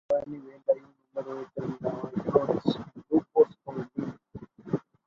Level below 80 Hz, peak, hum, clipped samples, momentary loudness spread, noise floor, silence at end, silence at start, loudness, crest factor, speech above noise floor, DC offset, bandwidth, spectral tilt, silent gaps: -64 dBFS; -8 dBFS; none; under 0.1%; 15 LU; -47 dBFS; 0.25 s; 0.1 s; -30 LUFS; 22 dB; 16 dB; under 0.1%; 7 kHz; -9 dB/octave; none